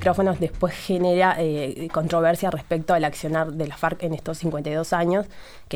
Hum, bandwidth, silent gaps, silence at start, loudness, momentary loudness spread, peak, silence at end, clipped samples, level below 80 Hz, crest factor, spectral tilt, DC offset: none; 19.5 kHz; none; 0 s; -23 LUFS; 8 LU; -6 dBFS; 0 s; under 0.1%; -46 dBFS; 16 dB; -6 dB/octave; under 0.1%